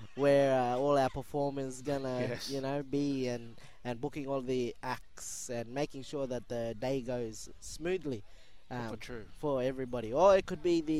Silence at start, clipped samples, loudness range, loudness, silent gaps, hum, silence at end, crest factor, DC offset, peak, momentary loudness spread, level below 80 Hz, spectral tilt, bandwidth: 0 s; under 0.1%; 6 LU; -34 LUFS; none; none; 0 s; 20 dB; 0.4%; -14 dBFS; 15 LU; -56 dBFS; -5.5 dB/octave; 15.5 kHz